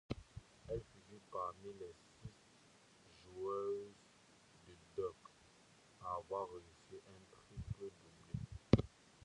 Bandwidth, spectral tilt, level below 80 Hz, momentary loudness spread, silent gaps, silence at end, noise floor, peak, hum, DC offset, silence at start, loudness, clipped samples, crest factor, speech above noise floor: 11 kHz; -7.5 dB/octave; -60 dBFS; 24 LU; none; 0.4 s; -68 dBFS; -12 dBFS; none; under 0.1%; 0.1 s; -45 LUFS; under 0.1%; 34 dB; 22 dB